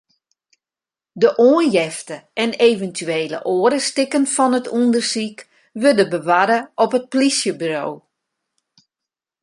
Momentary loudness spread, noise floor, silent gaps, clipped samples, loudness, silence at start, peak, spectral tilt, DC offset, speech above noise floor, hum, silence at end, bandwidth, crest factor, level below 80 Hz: 10 LU; under -90 dBFS; none; under 0.1%; -17 LUFS; 1.15 s; -2 dBFS; -3.5 dB/octave; under 0.1%; over 73 dB; none; 1.45 s; 11.5 kHz; 18 dB; -68 dBFS